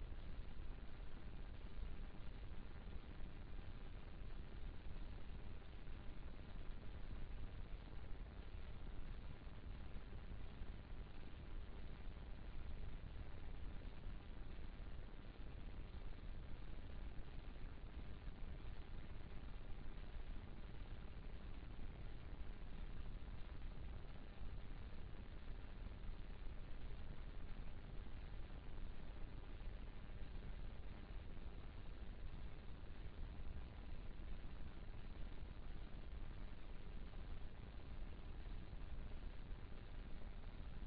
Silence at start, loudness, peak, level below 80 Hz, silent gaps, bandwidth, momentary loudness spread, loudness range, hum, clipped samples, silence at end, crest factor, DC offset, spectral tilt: 0 s; -57 LUFS; -36 dBFS; -52 dBFS; none; 4.9 kHz; 2 LU; 1 LU; none; under 0.1%; 0 s; 12 dB; under 0.1%; -6 dB/octave